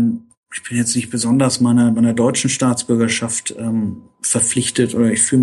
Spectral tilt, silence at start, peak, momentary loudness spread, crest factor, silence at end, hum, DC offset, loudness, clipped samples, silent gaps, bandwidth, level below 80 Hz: -4 dB/octave; 0 s; -2 dBFS; 9 LU; 14 dB; 0 s; none; under 0.1%; -16 LUFS; under 0.1%; 0.37-0.43 s; 12.5 kHz; -56 dBFS